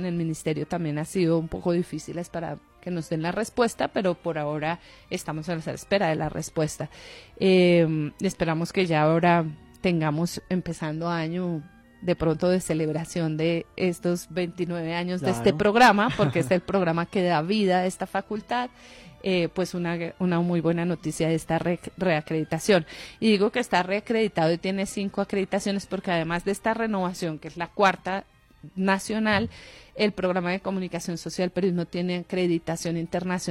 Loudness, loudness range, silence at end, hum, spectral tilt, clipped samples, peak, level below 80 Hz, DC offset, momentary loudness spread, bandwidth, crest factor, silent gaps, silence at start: -26 LUFS; 5 LU; 0 s; none; -6 dB/octave; under 0.1%; -8 dBFS; -54 dBFS; under 0.1%; 10 LU; 15.5 kHz; 18 dB; none; 0 s